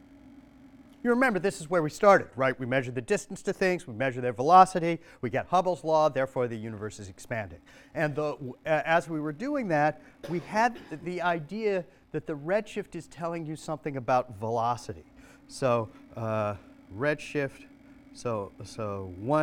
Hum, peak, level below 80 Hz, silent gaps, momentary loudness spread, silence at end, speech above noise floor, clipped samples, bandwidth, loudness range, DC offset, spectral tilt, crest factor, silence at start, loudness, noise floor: none; -4 dBFS; -62 dBFS; none; 14 LU; 0 s; 25 dB; under 0.1%; 16 kHz; 7 LU; under 0.1%; -6 dB/octave; 24 dB; 0.25 s; -28 LUFS; -53 dBFS